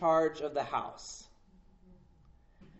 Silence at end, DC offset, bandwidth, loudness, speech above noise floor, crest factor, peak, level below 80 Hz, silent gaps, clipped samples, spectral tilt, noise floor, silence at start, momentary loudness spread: 0 s; under 0.1%; 8 kHz; -34 LUFS; 29 dB; 20 dB; -16 dBFS; -62 dBFS; none; under 0.1%; -4 dB/octave; -61 dBFS; 0 s; 18 LU